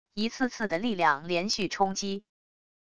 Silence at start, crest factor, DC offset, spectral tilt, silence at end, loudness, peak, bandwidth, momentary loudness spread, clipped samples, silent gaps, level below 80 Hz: 0.05 s; 20 dB; 0.4%; -3.5 dB/octave; 0.65 s; -29 LUFS; -10 dBFS; 11 kHz; 8 LU; under 0.1%; none; -62 dBFS